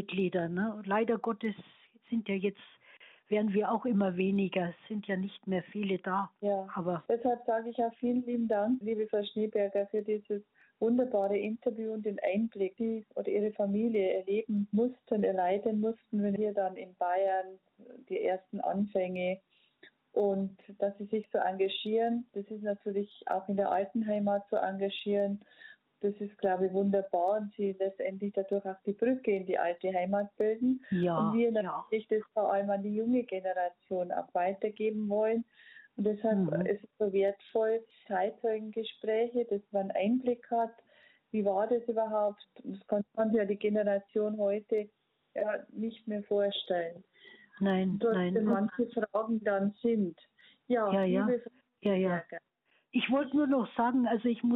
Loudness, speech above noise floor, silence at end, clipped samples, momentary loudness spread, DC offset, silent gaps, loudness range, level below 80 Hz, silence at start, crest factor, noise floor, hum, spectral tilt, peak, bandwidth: -32 LUFS; 31 dB; 0 s; under 0.1%; 7 LU; under 0.1%; none; 3 LU; -76 dBFS; 0 s; 14 dB; -63 dBFS; none; -9.5 dB/octave; -18 dBFS; 4.1 kHz